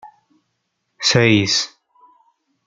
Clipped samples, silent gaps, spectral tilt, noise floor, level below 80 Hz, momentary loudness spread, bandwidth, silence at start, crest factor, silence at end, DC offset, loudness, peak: under 0.1%; none; -4 dB/octave; -73 dBFS; -54 dBFS; 8 LU; 9.6 kHz; 0.05 s; 20 dB; 1 s; under 0.1%; -16 LUFS; -2 dBFS